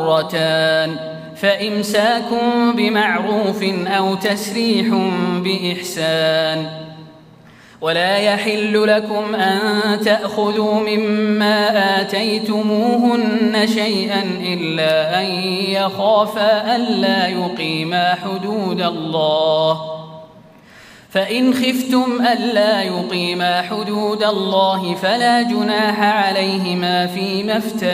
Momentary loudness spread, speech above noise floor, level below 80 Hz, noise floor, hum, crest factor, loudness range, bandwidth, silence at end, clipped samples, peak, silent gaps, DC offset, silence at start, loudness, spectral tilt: 5 LU; 27 dB; -64 dBFS; -44 dBFS; none; 14 dB; 3 LU; 15.5 kHz; 0 s; under 0.1%; -2 dBFS; none; under 0.1%; 0 s; -17 LUFS; -5 dB/octave